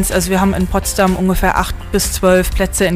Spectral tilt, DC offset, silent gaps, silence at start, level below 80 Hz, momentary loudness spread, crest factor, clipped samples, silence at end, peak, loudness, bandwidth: -4.5 dB/octave; under 0.1%; none; 0 s; -22 dBFS; 4 LU; 12 dB; under 0.1%; 0 s; -2 dBFS; -15 LUFS; 16 kHz